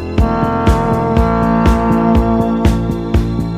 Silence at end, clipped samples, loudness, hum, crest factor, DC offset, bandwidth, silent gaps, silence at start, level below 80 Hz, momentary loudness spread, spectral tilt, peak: 0 s; 0.1%; -14 LUFS; none; 12 dB; under 0.1%; 15 kHz; none; 0 s; -20 dBFS; 4 LU; -8 dB/octave; 0 dBFS